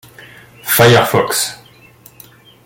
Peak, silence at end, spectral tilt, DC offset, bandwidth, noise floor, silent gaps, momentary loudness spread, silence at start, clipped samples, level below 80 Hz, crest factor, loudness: 0 dBFS; 1.1 s; -3.5 dB/octave; under 0.1%; 17 kHz; -44 dBFS; none; 12 LU; 0.65 s; under 0.1%; -50 dBFS; 16 dB; -12 LUFS